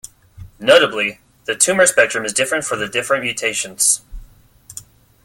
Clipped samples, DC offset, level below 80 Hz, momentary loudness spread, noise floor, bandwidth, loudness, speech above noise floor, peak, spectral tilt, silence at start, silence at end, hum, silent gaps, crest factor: under 0.1%; under 0.1%; -46 dBFS; 18 LU; -45 dBFS; 17 kHz; -16 LUFS; 29 dB; 0 dBFS; -1 dB/octave; 0.4 s; 0.4 s; none; none; 18 dB